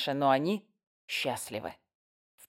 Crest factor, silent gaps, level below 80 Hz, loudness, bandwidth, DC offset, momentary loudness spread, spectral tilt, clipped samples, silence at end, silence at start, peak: 22 dB; 0.87-1.08 s; -74 dBFS; -31 LUFS; 16.5 kHz; under 0.1%; 13 LU; -4.5 dB/octave; under 0.1%; 0.75 s; 0 s; -12 dBFS